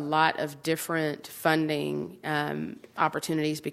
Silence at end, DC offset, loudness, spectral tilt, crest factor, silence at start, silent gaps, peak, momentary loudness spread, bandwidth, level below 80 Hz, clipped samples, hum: 0 s; under 0.1%; -29 LUFS; -4.5 dB/octave; 22 dB; 0 s; none; -6 dBFS; 8 LU; 16 kHz; -70 dBFS; under 0.1%; none